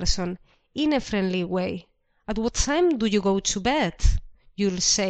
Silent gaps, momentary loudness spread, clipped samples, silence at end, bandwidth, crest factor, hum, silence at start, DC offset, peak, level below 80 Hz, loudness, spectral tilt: none; 14 LU; under 0.1%; 0 s; 9.2 kHz; 18 dB; none; 0 s; under 0.1%; -6 dBFS; -32 dBFS; -24 LUFS; -4 dB/octave